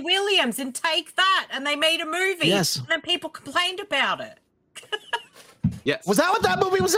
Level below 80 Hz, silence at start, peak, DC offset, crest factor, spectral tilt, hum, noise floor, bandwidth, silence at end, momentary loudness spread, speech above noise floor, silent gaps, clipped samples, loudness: -56 dBFS; 0 s; -6 dBFS; under 0.1%; 18 dB; -3 dB/octave; none; -48 dBFS; 17.5 kHz; 0 s; 9 LU; 25 dB; none; under 0.1%; -23 LUFS